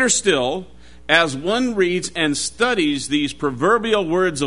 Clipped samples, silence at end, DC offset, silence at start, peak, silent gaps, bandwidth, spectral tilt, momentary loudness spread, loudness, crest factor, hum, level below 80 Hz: under 0.1%; 0 s; 0.7%; 0 s; 0 dBFS; none; 11 kHz; -3 dB/octave; 5 LU; -19 LUFS; 20 dB; none; -48 dBFS